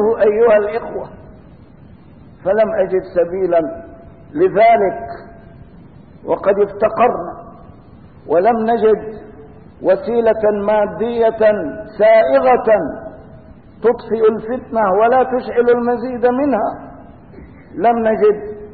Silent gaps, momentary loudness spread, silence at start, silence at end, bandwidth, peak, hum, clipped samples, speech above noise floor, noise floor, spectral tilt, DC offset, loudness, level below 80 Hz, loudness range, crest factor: none; 17 LU; 0 s; 0 s; 4.7 kHz; -4 dBFS; none; under 0.1%; 27 dB; -41 dBFS; -11.5 dB/octave; 0.3%; -15 LUFS; -46 dBFS; 4 LU; 12 dB